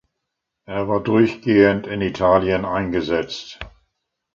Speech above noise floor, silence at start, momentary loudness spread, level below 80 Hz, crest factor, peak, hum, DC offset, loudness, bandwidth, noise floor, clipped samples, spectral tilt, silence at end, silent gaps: 61 dB; 0.7 s; 15 LU; -46 dBFS; 18 dB; -2 dBFS; none; under 0.1%; -19 LUFS; 7.4 kHz; -79 dBFS; under 0.1%; -7 dB/octave; 0.65 s; none